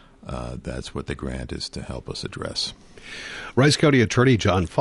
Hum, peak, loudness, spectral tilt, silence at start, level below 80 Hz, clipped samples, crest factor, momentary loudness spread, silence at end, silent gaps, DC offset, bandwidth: none; -6 dBFS; -23 LUFS; -5.5 dB/octave; 0.25 s; -40 dBFS; under 0.1%; 18 dB; 17 LU; 0 s; none; under 0.1%; 11.5 kHz